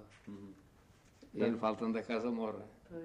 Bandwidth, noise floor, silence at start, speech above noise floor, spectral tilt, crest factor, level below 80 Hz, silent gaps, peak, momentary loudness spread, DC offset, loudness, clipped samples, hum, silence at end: 9.8 kHz; -64 dBFS; 0 s; 27 dB; -7 dB/octave; 18 dB; -70 dBFS; none; -20 dBFS; 18 LU; under 0.1%; -37 LUFS; under 0.1%; none; 0 s